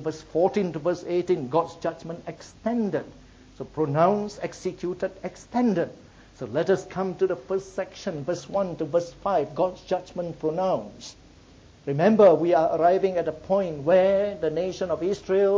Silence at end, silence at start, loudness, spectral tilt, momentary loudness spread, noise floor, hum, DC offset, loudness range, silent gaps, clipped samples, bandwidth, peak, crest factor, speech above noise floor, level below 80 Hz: 0 s; 0 s; -25 LUFS; -7 dB/octave; 13 LU; -51 dBFS; none; under 0.1%; 7 LU; none; under 0.1%; 8 kHz; -6 dBFS; 18 dB; 27 dB; -56 dBFS